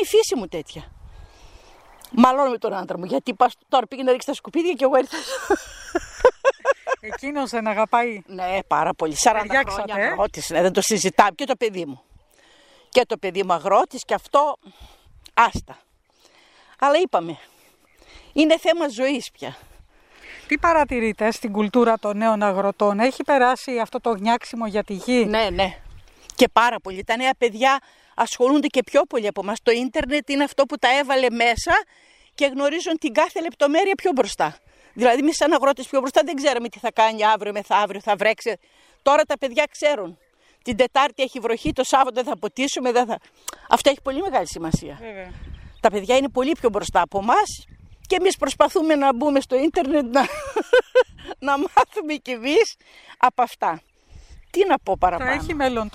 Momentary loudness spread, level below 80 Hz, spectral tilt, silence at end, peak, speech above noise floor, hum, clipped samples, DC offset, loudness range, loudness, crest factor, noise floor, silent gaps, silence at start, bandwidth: 9 LU; -48 dBFS; -3.5 dB/octave; 0.05 s; 0 dBFS; 38 dB; none; under 0.1%; under 0.1%; 3 LU; -21 LUFS; 20 dB; -59 dBFS; none; 0 s; 15.5 kHz